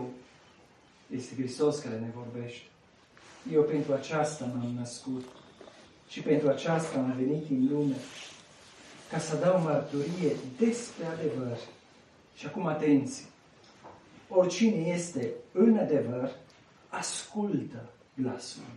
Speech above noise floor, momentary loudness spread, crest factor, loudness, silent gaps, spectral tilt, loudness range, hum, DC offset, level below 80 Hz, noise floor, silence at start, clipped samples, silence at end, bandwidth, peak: 30 dB; 18 LU; 20 dB; -30 LUFS; none; -6 dB/octave; 4 LU; none; under 0.1%; -74 dBFS; -59 dBFS; 0 s; under 0.1%; 0 s; 11.5 kHz; -12 dBFS